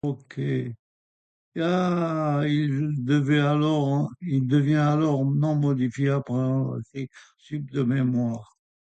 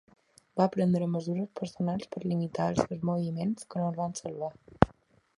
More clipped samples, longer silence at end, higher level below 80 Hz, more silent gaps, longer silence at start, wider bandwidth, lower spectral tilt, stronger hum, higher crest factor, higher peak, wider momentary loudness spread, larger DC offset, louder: neither; about the same, 0.4 s vs 0.5 s; second, -64 dBFS vs -52 dBFS; first, 0.79-1.52 s vs none; second, 0.05 s vs 0.55 s; second, 8.2 kHz vs 11.5 kHz; about the same, -8 dB/octave vs -7 dB/octave; neither; second, 14 dB vs 30 dB; second, -10 dBFS vs 0 dBFS; first, 12 LU vs 9 LU; neither; first, -24 LUFS vs -31 LUFS